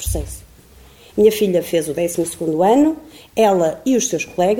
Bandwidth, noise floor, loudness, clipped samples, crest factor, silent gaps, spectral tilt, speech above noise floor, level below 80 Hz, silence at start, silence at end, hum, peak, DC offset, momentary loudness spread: 19.5 kHz; -45 dBFS; -17 LUFS; under 0.1%; 16 dB; none; -5 dB/octave; 28 dB; -38 dBFS; 0 s; 0 s; none; -2 dBFS; 0.1%; 13 LU